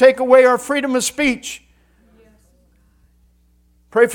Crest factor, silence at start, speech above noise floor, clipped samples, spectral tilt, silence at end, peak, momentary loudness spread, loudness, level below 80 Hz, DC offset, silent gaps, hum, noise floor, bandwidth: 18 dB; 0 s; 42 dB; under 0.1%; -2.5 dB/octave; 0 s; 0 dBFS; 16 LU; -15 LUFS; -52 dBFS; under 0.1%; none; 60 Hz at -55 dBFS; -56 dBFS; 18 kHz